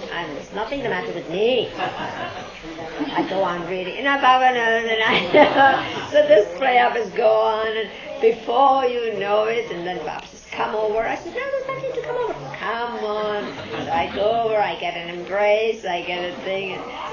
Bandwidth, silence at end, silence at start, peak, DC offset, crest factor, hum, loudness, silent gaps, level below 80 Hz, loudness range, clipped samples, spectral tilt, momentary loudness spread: 7.2 kHz; 0 s; 0 s; 0 dBFS; under 0.1%; 20 dB; none; -21 LUFS; none; -54 dBFS; 9 LU; under 0.1%; -4.5 dB/octave; 13 LU